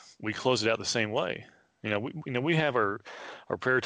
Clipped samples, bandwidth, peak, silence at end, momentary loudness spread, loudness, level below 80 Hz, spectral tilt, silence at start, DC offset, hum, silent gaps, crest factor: under 0.1%; 10 kHz; -14 dBFS; 0 s; 13 LU; -30 LUFS; -70 dBFS; -4.5 dB/octave; 0.05 s; under 0.1%; none; none; 18 dB